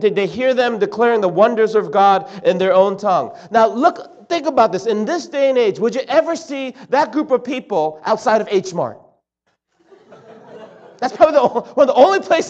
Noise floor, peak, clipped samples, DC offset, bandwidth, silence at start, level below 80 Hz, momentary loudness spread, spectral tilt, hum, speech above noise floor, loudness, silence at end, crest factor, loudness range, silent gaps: -69 dBFS; 0 dBFS; under 0.1%; under 0.1%; 8.2 kHz; 0 s; -64 dBFS; 10 LU; -5 dB/octave; none; 54 dB; -16 LUFS; 0 s; 16 dB; 6 LU; none